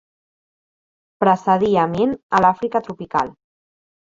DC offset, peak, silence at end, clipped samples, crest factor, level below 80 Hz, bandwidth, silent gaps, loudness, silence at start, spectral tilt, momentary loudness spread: under 0.1%; -2 dBFS; 0.8 s; under 0.1%; 18 dB; -56 dBFS; 7.6 kHz; 2.23-2.29 s; -19 LUFS; 1.2 s; -7 dB/octave; 8 LU